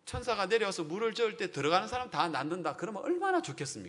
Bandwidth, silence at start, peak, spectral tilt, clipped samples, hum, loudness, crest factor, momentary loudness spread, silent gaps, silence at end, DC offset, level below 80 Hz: 11 kHz; 0.05 s; -12 dBFS; -4 dB/octave; under 0.1%; none; -32 LUFS; 22 dB; 6 LU; none; 0 s; under 0.1%; -60 dBFS